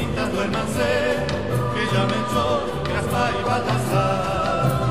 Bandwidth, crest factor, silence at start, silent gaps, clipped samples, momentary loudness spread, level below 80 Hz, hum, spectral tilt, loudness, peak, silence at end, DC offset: 15.5 kHz; 14 dB; 0 s; none; under 0.1%; 3 LU; -38 dBFS; none; -5.5 dB/octave; -22 LUFS; -8 dBFS; 0 s; 1%